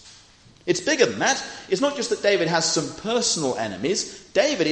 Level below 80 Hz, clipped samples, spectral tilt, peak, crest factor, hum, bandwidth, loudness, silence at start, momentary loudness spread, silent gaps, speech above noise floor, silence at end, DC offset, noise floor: -60 dBFS; under 0.1%; -2.5 dB/octave; -4 dBFS; 20 dB; none; 10 kHz; -22 LUFS; 0.05 s; 7 LU; none; 29 dB; 0 s; under 0.1%; -52 dBFS